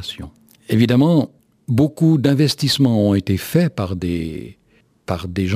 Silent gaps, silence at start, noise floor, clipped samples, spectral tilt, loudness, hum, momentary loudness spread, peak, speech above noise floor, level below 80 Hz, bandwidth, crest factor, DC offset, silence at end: none; 0 s; -57 dBFS; under 0.1%; -6.5 dB/octave; -17 LUFS; none; 16 LU; -2 dBFS; 40 dB; -46 dBFS; 16 kHz; 16 dB; under 0.1%; 0 s